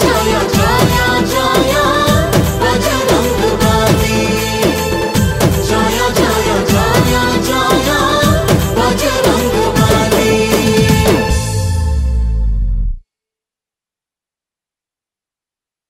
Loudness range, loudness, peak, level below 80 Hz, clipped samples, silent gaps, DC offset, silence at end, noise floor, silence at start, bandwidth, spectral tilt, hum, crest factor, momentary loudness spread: 8 LU; -12 LUFS; 0 dBFS; -22 dBFS; under 0.1%; none; under 0.1%; 2.9 s; -88 dBFS; 0 s; 16.5 kHz; -4.5 dB/octave; none; 12 dB; 5 LU